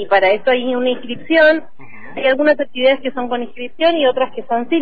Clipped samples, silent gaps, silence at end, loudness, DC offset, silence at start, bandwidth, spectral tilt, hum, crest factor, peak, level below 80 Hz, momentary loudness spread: under 0.1%; none; 0 s; -16 LUFS; 4%; 0 s; 5 kHz; -6.5 dB/octave; none; 14 dB; -2 dBFS; -54 dBFS; 10 LU